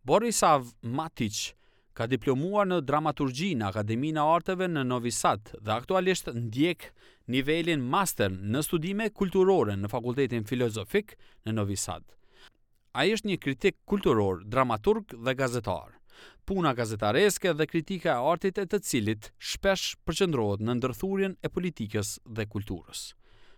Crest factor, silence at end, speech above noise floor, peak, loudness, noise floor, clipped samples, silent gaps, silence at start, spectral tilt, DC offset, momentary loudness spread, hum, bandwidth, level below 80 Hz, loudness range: 18 dB; 0.05 s; 33 dB; -10 dBFS; -28 LUFS; -61 dBFS; under 0.1%; none; 0.05 s; -5 dB/octave; under 0.1%; 10 LU; none; 19 kHz; -54 dBFS; 3 LU